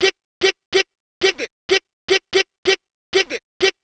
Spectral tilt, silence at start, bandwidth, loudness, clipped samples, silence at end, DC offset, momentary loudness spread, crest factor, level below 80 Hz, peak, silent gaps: -1.5 dB/octave; 0 s; 8.8 kHz; -19 LUFS; under 0.1%; 0.1 s; under 0.1%; 4 LU; 18 dB; -56 dBFS; 0 dBFS; 0.24-0.41 s, 0.65-0.72 s, 1.00-1.21 s, 1.52-1.69 s, 1.93-2.08 s, 2.58-2.63 s, 2.91-3.13 s, 3.43-3.60 s